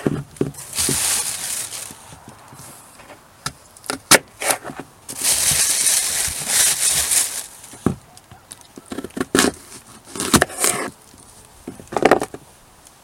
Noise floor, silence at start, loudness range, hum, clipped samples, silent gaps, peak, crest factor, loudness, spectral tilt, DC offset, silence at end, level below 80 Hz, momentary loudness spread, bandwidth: -48 dBFS; 0 s; 7 LU; none; under 0.1%; none; 0 dBFS; 22 dB; -18 LUFS; -1.5 dB/octave; under 0.1%; 0.65 s; -48 dBFS; 24 LU; 17 kHz